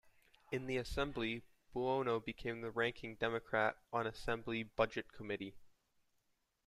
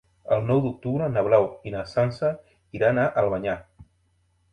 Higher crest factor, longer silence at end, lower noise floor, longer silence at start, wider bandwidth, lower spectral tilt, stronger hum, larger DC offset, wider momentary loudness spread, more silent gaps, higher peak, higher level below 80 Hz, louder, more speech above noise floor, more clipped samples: about the same, 22 dB vs 18 dB; first, 1 s vs 0.7 s; first, -81 dBFS vs -67 dBFS; first, 0.5 s vs 0.25 s; first, 14.5 kHz vs 9.6 kHz; second, -5.5 dB/octave vs -8.5 dB/octave; neither; neither; second, 8 LU vs 11 LU; neither; second, -18 dBFS vs -6 dBFS; second, -60 dBFS vs -54 dBFS; second, -40 LUFS vs -24 LUFS; about the same, 42 dB vs 43 dB; neither